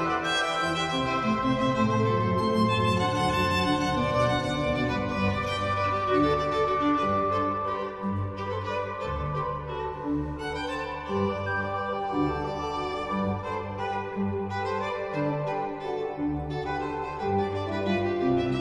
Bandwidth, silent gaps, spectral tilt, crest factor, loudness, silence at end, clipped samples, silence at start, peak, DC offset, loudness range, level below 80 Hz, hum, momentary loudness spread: 12 kHz; none; -6 dB/octave; 14 dB; -28 LUFS; 0 s; under 0.1%; 0 s; -12 dBFS; under 0.1%; 6 LU; -46 dBFS; none; 7 LU